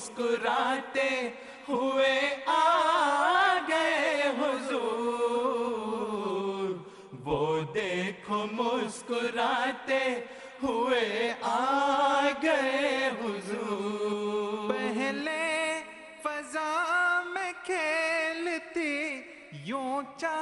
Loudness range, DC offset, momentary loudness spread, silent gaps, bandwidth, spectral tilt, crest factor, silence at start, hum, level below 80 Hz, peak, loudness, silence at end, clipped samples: 5 LU; under 0.1%; 10 LU; none; 11.5 kHz; -3.5 dB/octave; 16 dB; 0 s; none; -68 dBFS; -14 dBFS; -29 LUFS; 0 s; under 0.1%